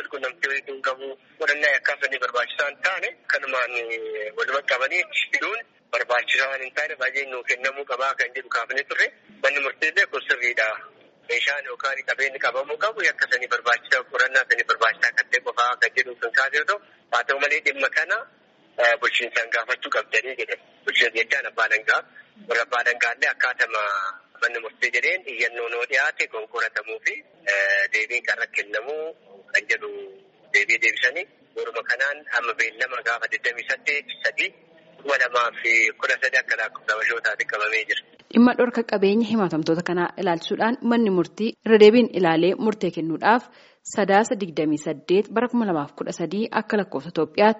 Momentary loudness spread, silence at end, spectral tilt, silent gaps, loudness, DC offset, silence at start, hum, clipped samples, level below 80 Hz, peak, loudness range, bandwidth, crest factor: 8 LU; 0 s; -1.5 dB/octave; none; -22 LUFS; under 0.1%; 0 s; none; under 0.1%; -74 dBFS; -2 dBFS; 4 LU; 8 kHz; 22 dB